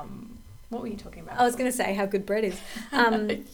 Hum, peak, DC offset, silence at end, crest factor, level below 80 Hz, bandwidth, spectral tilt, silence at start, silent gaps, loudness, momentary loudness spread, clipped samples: none; -8 dBFS; under 0.1%; 0 s; 18 dB; -50 dBFS; over 20 kHz; -4 dB/octave; 0 s; none; -27 LUFS; 17 LU; under 0.1%